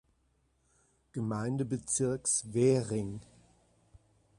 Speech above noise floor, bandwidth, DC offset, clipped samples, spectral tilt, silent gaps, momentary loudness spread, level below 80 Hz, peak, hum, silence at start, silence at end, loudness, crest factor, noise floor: 42 dB; 11.5 kHz; under 0.1%; under 0.1%; -5.5 dB/octave; none; 13 LU; -64 dBFS; -16 dBFS; none; 1.15 s; 1.2 s; -32 LUFS; 20 dB; -73 dBFS